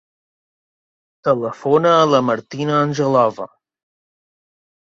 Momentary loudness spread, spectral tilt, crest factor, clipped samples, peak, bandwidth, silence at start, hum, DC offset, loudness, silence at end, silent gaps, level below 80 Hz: 10 LU; -6 dB/octave; 18 dB; under 0.1%; -2 dBFS; 7.6 kHz; 1.25 s; none; under 0.1%; -17 LUFS; 1.4 s; none; -62 dBFS